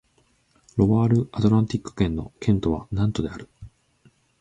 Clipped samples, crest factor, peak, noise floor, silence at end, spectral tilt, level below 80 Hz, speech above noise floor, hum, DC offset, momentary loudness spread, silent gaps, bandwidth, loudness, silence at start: under 0.1%; 20 dB; -4 dBFS; -64 dBFS; 0.75 s; -8.5 dB/octave; -42 dBFS; 42 dB; none; under 0.1%; 10 LU; none; 8.8 kHz; -23 LUFS; 0.75 s